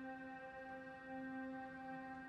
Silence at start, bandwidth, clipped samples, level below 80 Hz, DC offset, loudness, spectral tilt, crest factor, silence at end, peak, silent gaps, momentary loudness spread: 0 s; 9.2 kHz; under 0.1%; -78 dBFS; under 0.1%; -51 LUFS; -6.5 dB/octave; 12 dB; 0 s; -38 dBFS; none; 4 LU